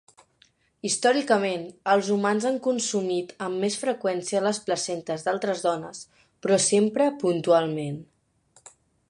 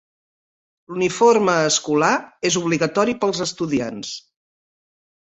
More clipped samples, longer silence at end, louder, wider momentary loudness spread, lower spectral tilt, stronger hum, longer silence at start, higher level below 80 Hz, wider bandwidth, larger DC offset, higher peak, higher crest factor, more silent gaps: neither; about the same, 1.05 s vs 1.05 s; second, -25 LUFS vs -19 LUFS; second, 10 LU vs 14 LU; about the same, -4 dB/octave vs -3.5 dB/octave; neither; about the same, 0.85 s vs 0.9 s; second, -72 dBFS vs -60 dBFS; first, 11 kHz vs 8.4 kHz; neither; second, -6 dBFS vs -2 dBFS; about the same, 20 dB vs 18 dB; neither